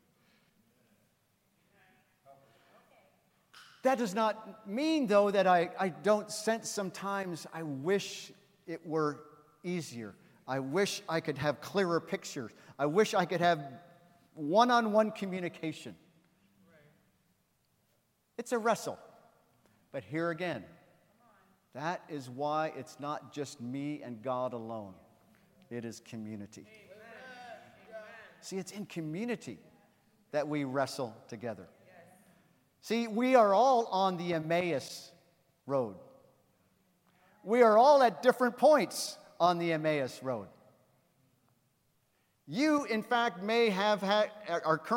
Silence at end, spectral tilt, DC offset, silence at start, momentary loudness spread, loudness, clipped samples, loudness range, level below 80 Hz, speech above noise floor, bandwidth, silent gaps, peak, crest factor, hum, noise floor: 0 s; -5 dB/octave; under 0.1%; 2.3 s; 21 LU; -31 LUFS; under 0.1%; 14 LU; -82 dBFS; 43 dB; 16.5 kHz; none; -10 dBFS; 22 dB; none; -75 dBFS